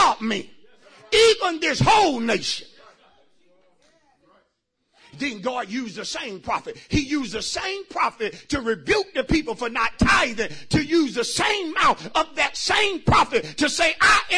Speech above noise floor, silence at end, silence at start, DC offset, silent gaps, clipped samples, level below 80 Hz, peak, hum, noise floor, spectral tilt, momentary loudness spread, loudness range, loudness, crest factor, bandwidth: 51 dB; 0 s; 0 s; under 0.1%; none; under 0.1%; -42 dBFS; -6 dBFS; none; -73 dBFS; -3.5 dB/octave; 12 LU; 11 LU; -21 LUFS; 16 dB; 11 kHz